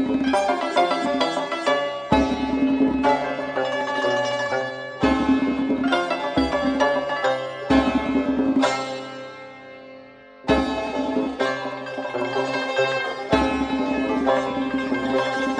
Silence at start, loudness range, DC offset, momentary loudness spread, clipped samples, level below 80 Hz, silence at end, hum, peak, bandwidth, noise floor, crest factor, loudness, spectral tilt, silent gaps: 0 s; 4 LU; under 0.1%; 9 LU; under 0.1%; -44 dBFS; 0 s; none; -4 dBFS; 10 kHz; -44 dBFS; 18 dB; -22 LUFS; -5 dB/octave; none